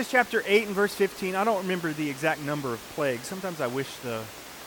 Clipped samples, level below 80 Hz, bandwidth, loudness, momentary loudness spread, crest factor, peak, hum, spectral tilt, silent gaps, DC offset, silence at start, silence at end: under 0.1%; -64 dBFS; 19 kHz; -28 LUFS; 10 LU; 20 dB; -6 dBFS; none; -4.5 dB/octave; none; under 0.1%; 0 s; 0 s